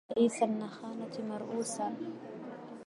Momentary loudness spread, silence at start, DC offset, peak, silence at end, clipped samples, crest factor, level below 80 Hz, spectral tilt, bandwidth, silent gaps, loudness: 16 LU; 0.1 s; under 0.1%; -16 dBFS; 0.05 s; under 0.1%; 20 dB; -82 dBFS; -5 dB/octave; 11.5 kHz; none; -36 LUFS